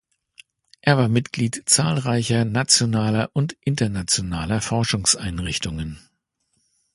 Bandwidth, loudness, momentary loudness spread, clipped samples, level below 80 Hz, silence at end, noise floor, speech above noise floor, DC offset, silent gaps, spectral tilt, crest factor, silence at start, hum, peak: 11.5 kHz; -21 LUFS; 9 LU; under 0.1%; -44 dBFS; 0.95 s; -71 dBFS; 50 dB; under 0.1%; none; -4 dB/octave; 22 dB; 0.85 s; none; -2 dBFS